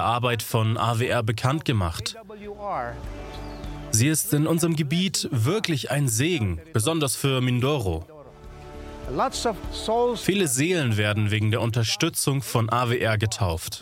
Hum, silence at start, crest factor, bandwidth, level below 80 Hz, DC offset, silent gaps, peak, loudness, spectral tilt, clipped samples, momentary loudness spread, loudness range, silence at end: none; 0 s; 22 dB; 16.5 kHz; -44 dBFS; under 0.1%; none; -2 dBFS; -24 LUFS; -4.5 dB/octave; under 0.1%; 15 LU; 3 LU; 0 s